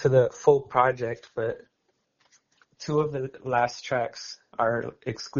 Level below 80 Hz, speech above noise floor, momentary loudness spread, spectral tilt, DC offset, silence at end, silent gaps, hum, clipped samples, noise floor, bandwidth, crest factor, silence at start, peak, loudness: -62 dBFS; 49 dB; 13 LU; -5 dB/octave; under 0.1%; 0 s; none; none; under 0.1%; -74 dBFS; 7.2 kHz; 22 dB; 0 s; -6 dBFS; -26 LUFS